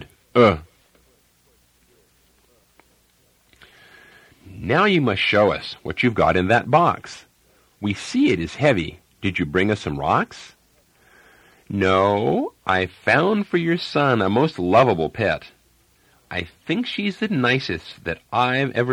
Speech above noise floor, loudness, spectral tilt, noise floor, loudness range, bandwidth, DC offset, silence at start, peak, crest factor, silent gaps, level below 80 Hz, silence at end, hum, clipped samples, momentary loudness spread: 41 dB; -20 LUFS; -6 dB/octave; -60 dBFS; 6 LU; 15.5 kHz; under 0.1%; 0 s; -2 dBFS; 20 dB; none; -50 dBFS; 0 s; none; under 0.1%; 13 LU